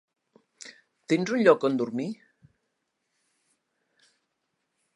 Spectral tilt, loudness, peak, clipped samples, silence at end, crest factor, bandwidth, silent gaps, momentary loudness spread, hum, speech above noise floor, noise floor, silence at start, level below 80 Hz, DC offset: -6 dB/octave; -25 LUFS; -6 dBFS; under 0.1%; 2.8 s; 24 dB; 11 kHz; none; 25 LU; none; 55 dB; -79 dBFS; 0.65 s; -80 dBFS; under 0.1%